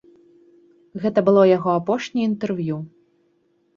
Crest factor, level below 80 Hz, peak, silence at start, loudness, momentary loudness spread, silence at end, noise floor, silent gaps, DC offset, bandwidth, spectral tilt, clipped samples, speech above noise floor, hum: 18 dB; -64 dBFS; -4 dBFS; 0.95 s; -20 LUFS; 15 LU; 0.9 s; -64 dBFS; none; under 0.1%; 7.4 kHz; -7.5 dB/octave; under 0.1%; 45 dB; none